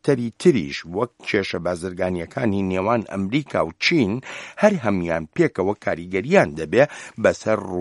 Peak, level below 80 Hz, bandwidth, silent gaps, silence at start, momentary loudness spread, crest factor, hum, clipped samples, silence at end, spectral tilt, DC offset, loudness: 0 dBFS; -54 dBFS; 11.5 kHz; none; 0.05 s; 7 LU; 20 dB; none; under 0.1%; 0 s; -6 dB/octave; under 0.1%; -21 LUFS